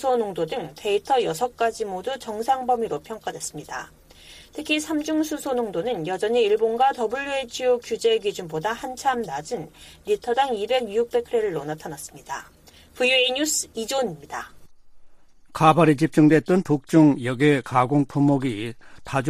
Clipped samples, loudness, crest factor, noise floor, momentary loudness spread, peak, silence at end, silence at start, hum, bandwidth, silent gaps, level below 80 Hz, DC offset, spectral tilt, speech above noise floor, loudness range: under 0.1%; -23 LUFS; 20 dB; -47 dBFS; 17 LU; -4 dBFS; 0 s; 0 s; none; 15.5 kHz; none; -56 dBFS; under 0.1%; -5 dB/octave; 25 dB; 8 LU